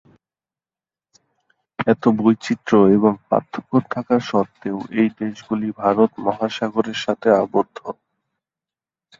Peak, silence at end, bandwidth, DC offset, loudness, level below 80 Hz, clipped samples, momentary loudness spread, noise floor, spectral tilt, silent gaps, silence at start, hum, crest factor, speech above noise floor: -2 dBFS; 1.3 s; 7.6 kHz; under 0.1%; -19 LUFS; -60 dBFS; under 0.1%; 11 LU; under -90 dBFS; -7 dB/octave; none; 1.8 s; none; 18 dB; over 71 dB